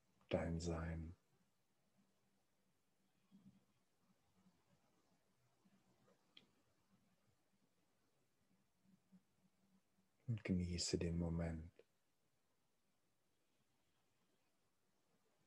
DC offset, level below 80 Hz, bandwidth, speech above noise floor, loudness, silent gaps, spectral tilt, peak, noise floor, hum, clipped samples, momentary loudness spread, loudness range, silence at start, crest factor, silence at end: under 0.1%; -66 dBFS; 11.5 kHz; 43 dB; -45 LUFS; none; -5.5 dB/octave; -26 dBFS; -87 dBFS; none; under 0.1%; 13 LU; 11 LU; 0.3 s; 26 dB; 3.75 s